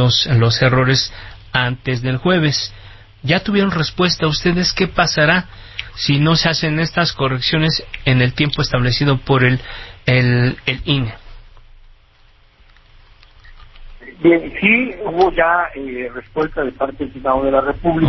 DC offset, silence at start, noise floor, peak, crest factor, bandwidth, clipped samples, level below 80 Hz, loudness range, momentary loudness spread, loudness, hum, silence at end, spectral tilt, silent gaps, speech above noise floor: under 0.1%; 0 s; -49 dBFS; 0 dBFS; 16 dB; 6.2 kHz; under 0.1%; -38 dBFS; 5 LU; 10 LU; -16 LUFS; none; 0 s; -5.5 dB/octave; none; 33 dB